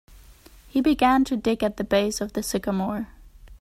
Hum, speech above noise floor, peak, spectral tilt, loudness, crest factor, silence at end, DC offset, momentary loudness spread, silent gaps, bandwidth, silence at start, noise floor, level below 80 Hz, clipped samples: none; 27 dB; -8 dBFS; -5 dB/octave; -24 LUFS; 16 dB; 0.05 s; under 0.1%; 9 LU; none; 16 kHz; 0.1 s; -49 dBFS; -46 dBFS; under 0.1%